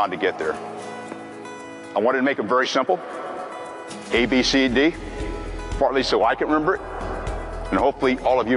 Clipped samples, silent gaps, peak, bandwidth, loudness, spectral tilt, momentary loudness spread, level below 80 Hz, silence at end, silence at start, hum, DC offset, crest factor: under 0.1%; none; -8 dBFS; 11.5 kHz; -22 LUFS; -4.5 dB/octave; 16 LU; -38 dBFS; 0 s; 0 s; none; under 0.1%; 14 dB